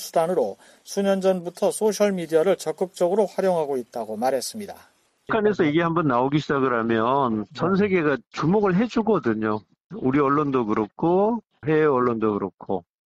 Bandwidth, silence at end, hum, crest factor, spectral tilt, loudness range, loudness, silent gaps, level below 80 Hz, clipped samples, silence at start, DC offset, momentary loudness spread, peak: 15 kHz; 0.3 s; none; 14 dB; -6 dB/octave; 2 LU; -23 LUFS; 9.80-9.90 s; -58 dBFS; under 0.1%; 0 s; under 0.1%; 9 LU; -8 dBFS